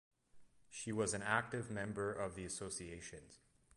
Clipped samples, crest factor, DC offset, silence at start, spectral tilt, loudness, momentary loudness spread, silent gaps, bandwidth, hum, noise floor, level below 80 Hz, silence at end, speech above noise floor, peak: under 0.1%; 24 dB; under 0.1%; 0.35 s; -4 dB/octave; -42 LUFS; 15 LU; none; 11.5 kHz; none; -63 dBFS; -66 dBFS; 0.4 s; 21 dB; -20 dBFS